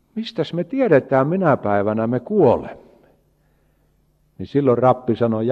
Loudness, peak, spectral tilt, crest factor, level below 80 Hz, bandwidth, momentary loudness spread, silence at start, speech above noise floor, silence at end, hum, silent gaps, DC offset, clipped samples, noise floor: -19 LUFS; -2 dBFS; -9 dB/octave; 18 dB; -56 dBFS; 7.2 kHz; 9 LU; 0.15 s; 43 dB; 0 s; none; none; under 0.1%; under 0.1%; -61 dBFS